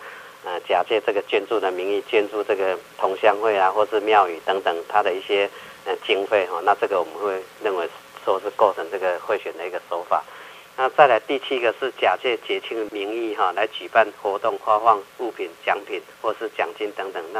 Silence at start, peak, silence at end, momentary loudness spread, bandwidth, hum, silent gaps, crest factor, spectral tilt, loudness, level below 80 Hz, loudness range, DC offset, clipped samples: 0 s; 0 dBFS; 0 s; 11 LU; 15.5 kHz; none; none; 22 dB; -3.5 dB/octave; -22 LUFS; -74 dBFS; 3 LU; under 0.1%; under 0.1%